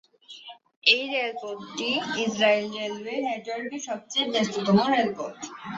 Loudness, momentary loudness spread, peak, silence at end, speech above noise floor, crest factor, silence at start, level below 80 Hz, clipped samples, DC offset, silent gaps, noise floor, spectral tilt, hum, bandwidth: -25 LUFS; 15 LU; -4 dBFS; 0 s; 20 dB; 24 dB; 0.3 s; -68 dBFS; under 0.1%; under 0.1%; 0.76-0.82 s; -46 dBFS; -4 dB/octave; none; 8 kHz